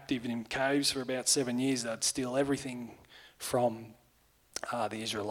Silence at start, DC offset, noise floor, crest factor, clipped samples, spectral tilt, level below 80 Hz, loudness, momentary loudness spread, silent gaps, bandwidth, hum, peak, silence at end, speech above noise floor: 0 s; under 0.1%; -67 dBFS; 20 dB; under 0.1%; -3 dB/octave; -66 dBFS; -32 LUFS; 13 LU; none; 18 kHz; none; -14 dBFS; 0 s; 35 dB